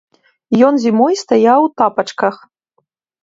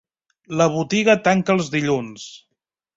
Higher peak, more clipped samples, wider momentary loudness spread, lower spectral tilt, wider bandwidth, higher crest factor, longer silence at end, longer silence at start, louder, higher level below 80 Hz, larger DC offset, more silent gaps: about the same, 0 dBFS vs -2 dBFS; neither; second, 7 LU vs 18 LU; about the same, -5.5 dB/octave vs -5 dB/octave; about the same, 7.8 kHz vs 7.8 kHz; about the same, 14 dB vs 18 dB; first, 0.9 s vs 0.6 s; about the same, 0.5 s vs 0.5 s; first, -13 LUFS vs -19 LUFS; about the same, -64 dBFS vs -60 dBFS; neither; neither